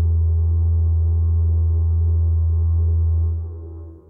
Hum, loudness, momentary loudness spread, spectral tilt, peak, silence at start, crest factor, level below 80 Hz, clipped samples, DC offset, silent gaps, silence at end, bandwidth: none; -19 LUFS; 7 LU; -16 dB/octave; -12 dBFS; 0 s; 4 dB; -22 dBFS; under 0.1%; under 0.1%; none; 0.1 s; 1.2 kHz